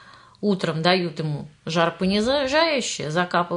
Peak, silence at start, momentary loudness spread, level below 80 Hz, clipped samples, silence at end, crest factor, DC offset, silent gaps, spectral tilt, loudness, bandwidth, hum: -4 dBFS; 0.05 s; 8 LU; -54 dBFS; under 0.1%; 0 s; 20 dB; under 0.1%; none; -4.5 dB/octave; -22 LUFS; 11 kHz; none